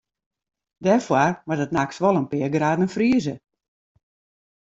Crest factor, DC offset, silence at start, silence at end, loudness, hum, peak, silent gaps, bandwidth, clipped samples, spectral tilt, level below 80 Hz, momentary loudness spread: 18 dB; under 0.1%; 0.8 s; 1.3 s; -22 LUFS; none; -4 dBFS; none; 7.8 kHz; under 0.1%; -6.5 dB/octave; -60 dBFS; 7 LU